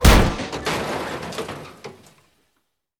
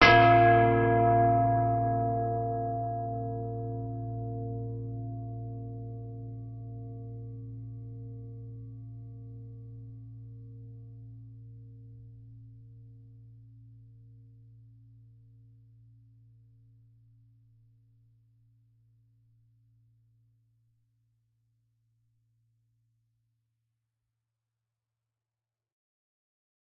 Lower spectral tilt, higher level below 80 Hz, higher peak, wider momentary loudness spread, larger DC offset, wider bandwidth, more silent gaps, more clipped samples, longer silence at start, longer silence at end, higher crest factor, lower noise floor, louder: about the same, -4.5 dB/octave vs -4.5 dB/octave; first, -24 dBFS vs -54 dBFS; first, 0 dBFS vs -8 dBFS; second, 22 LU vs 26 LU; neither; first, over 20 kHz vs 5.2 kHz; neither; neither; about the same, 0 s vs 0 s; second, 1.05 s vs 13 s; about the same, 22 dB vs 24 dB; second, -72 dBFS vs under -90 dBFS; first, -23 LUFS vs -28 LUFS